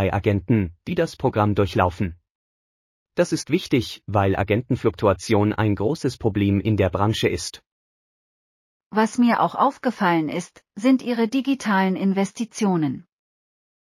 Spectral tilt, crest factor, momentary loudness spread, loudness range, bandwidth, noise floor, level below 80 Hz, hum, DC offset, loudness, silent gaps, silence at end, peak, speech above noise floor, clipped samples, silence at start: -6.5 dB/octave; 18 dB; 7 LU; 3 LU; 15 kHz; under -90 dBFS; -48 dBFS; none; under 0.1%; -22 LUFS; 2.30-3.06 s, 7.66-8.80 s, 8.86-8.90 s; 0.85 s; -4 dBFS; over 69 dB; under 0.1%; 0 s